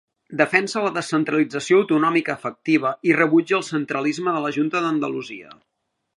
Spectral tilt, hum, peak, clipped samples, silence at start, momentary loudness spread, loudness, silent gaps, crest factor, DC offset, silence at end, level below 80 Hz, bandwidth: -5.5 dB/octave; none; 0 dBFS; under 0.1%; 0.3 s; 10 LU; -21 LUFS; none; 20 dB; under 0.1%; 0.65 s; -74 dBFS; 11 kHz